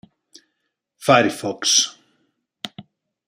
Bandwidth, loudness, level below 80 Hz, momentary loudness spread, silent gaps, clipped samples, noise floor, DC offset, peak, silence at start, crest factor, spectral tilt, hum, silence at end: 15.5 kHz; -18 LUFS; -68 dBFS; 19 LU; none; under 0.1%; -76 dBFS; under 0.1%; -2 dBFS; 1 s; 22 dB; -2 dB/octave; none; 0.45 s